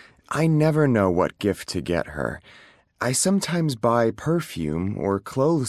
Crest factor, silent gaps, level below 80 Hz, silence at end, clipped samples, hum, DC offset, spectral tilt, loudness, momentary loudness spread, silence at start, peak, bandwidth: 16 dB; none; -46 dBFS; 0 s; under 0.1%; none; under 0.1%; -5.5 dB/octave; -23 LUFS; 9 LU; 0.3 s; -6 dBFS; 15 kHz